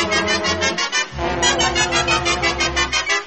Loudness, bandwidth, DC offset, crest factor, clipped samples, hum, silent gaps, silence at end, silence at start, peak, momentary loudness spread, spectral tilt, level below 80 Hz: -17 LUFS; 8.8 kHz; 0.4%; 16 dB; under 0.1%; none; none; 0 s; 0 s; -2 dBFS; 3 LU; -2 dB/octave; -36 dBFS